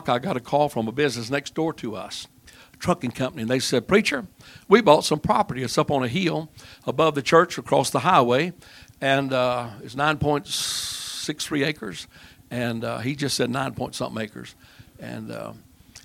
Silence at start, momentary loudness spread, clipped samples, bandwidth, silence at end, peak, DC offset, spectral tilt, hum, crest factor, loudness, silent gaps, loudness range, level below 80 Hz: 0 s; 16 LU; under 0.1%; 17 kHz; 0.05 s; 0 dBFS; under 0.1%; -4.5 dB/octave; none; 24 dB; -23 LUFS; none; 7 LU; -54 dBFS